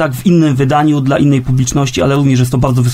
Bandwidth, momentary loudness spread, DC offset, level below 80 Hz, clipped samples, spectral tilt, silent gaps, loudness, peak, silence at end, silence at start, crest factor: 15.5 kHz; 2 LU; under 0.1%; -32 dBFS; under 0.1%; -6.5 dB/octave; none; -11 LUFS; 0 dBFS; 0 s; 0 s; 10 dB